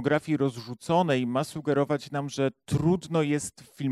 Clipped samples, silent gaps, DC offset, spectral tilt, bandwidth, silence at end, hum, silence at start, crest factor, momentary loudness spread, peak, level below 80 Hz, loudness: under 0.1%; none; under 0.1%; -6 dB/octave; 14 kHz; 0 s; none; 0 s; 16 dB; 7 LU; -10 dBFS; -58 dBFS; -27 LUFS